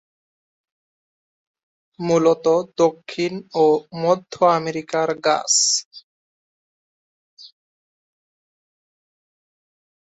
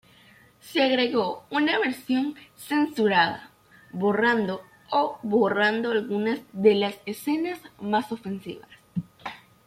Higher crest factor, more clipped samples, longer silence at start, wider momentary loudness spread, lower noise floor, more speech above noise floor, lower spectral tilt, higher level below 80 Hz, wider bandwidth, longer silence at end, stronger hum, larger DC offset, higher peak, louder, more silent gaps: about the same, 20 dB vs 20 dB; neither; first, 2 s vs 0.65 s; second, 9 LU vs 15 LU; first, under -90 dBFS vs -55 dBFS; first, over 71 dB vs 31 dB; second, -3 dB/octave vs -5.5 dB/octave; about the same, -68 dBFS vs -68 dBFS; second, 8.4 kHz vs 16 kHz; first, 2.7 s vs 0.3 s; neither; neither; first, -2 dBFS vs -6 dBFS; first, -19 LUFS vs -25 LUFS; first, 5.85-5.91 s, 6.03-7.37 s vs none